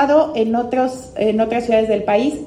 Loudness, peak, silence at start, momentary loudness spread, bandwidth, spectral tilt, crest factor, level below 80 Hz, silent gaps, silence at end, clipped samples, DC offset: -17 LUFS; -2 dBFS; 0 s; 5 LU; 11.5 kHz; -6 dB/octave; 14 dB; -48 dBFS; none; 0 s; under 0.1%; under 0.1%